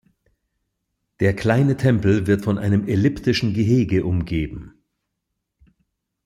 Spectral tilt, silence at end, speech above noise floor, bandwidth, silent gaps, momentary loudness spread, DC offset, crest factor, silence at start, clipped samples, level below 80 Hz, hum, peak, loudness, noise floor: -7.5 dB/octave; 1.55 s; 60 dB; 12.5 kHz; none; 6 LU; under 0.1%; 16 dB; 1.2 s; under 0.1%; -44 dBFS; none; -6 dBFS; -20 LUFS; -78 dBFS